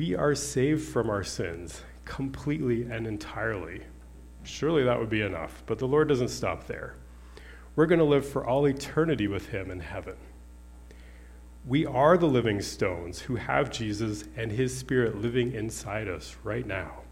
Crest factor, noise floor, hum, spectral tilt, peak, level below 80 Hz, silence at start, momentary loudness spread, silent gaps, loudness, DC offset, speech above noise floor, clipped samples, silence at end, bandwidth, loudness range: 22 dB; -48 dBFS; none; -6 dB/octave; -8 dBFS; -48 dBFS; 0 s; 17 LU; none; -28 LUFS; under 0.1%; 20 dB; under 0.1%; 0 s; 16 kHz; 5 LU